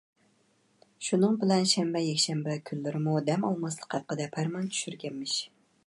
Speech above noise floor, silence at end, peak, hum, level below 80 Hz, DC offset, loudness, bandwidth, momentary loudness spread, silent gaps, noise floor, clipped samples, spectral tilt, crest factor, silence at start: 39 dB; 0.4 s; -10 dBFS; none; -78 dBFS; under 0.1%; -29 LUFS; 11.5 kHz; 10 LU; none; -68 dBFS; under 0.1%; -4.5 dB/octave; 20 dB; 1 s